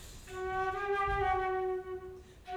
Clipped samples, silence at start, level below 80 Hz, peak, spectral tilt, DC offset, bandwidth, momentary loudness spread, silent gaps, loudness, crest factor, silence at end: under 0.1%; 0 s; -50 dBFS; -20 dBFS; -5.5 dB/octave; under 0.1%; 15.5 kHz; 15 LU; none; -34 LUFS; 14 dB; 0 s